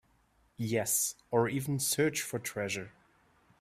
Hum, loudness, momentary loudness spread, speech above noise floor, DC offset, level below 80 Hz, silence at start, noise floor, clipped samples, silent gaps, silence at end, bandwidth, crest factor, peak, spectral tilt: none; -32 LUFS; 9 LU; 37 dB; under 0.1%; -68 dBFS; 0.6 s; -69 dBFS; under 0.1%; none; 0.7 s; 16 kHz; 20 dB; -14 dBFS; -3.5 dB/octave